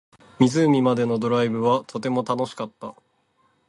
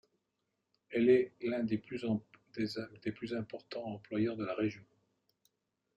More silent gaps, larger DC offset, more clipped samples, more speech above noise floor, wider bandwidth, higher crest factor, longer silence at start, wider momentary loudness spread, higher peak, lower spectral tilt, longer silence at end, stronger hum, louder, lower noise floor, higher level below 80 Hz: neither; neither; neither; second, 44 dB vs 50 dB; first, 11 kHz vs 8 kHz; about the same, 20 dB vs 20 dB; second, 0.4 s vs 0.9 s; about the same, 15 LU vs 14 LU; first, -4 dBFS vs -16 dBFS; about the same, -6.5 dB/octave vs -7.5 dB/octave; second, 0.8 s vs 1.15 s; neither; first, -22 LUFS vs -36 LUFS; second, -66 dBFS vs -85 dBFS; first, -64 dBFS vs -74 dBFS